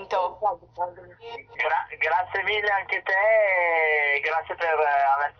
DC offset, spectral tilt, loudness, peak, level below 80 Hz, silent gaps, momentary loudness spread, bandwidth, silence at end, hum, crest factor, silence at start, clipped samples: under 0.1%; -3.5 dB/octave; -23 LUFS; -12 dBFS; -64 dBFS; none; 13 LU; 6.6 kHz; 0.1 s; none; 12 dB; 0 s; under 0.1%